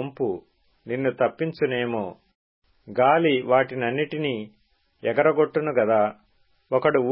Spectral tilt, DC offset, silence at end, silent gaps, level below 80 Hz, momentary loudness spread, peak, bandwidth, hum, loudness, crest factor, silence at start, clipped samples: -10.5 dB/octave; under 0.1%; 0 s; 2.35-2.62 s; -66 dBFS; 11 LU; -6 dBFS; 5.6 kHz; none; -23 LUFS; 18 dB; 0 s; under 0.1%